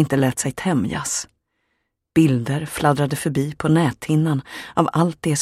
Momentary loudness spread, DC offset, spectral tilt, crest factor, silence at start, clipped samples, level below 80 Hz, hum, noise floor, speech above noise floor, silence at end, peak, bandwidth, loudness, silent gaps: 6 LU; under 0.1%; -5.5 dB/octave; 18 dB; 0 s; under 0.1%; -52 dBFS; none; -73 dBFS; 54 dB; 0 s; -2 dBFS; 15 kHz; -20 LUFS; none